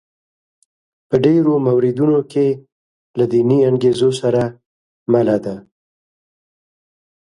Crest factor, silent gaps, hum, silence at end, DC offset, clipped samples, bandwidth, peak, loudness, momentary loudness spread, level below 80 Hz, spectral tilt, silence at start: 16 dB; 2.72-3.14 s, 4.66-5.06 s; none; 1.6 s; under 0.1%; under 0.1%; 11.5 kHz; 0 dBFS; -16 LUFS; 13 LU; -56 dBFS; -8 dB/octave; 1.1 s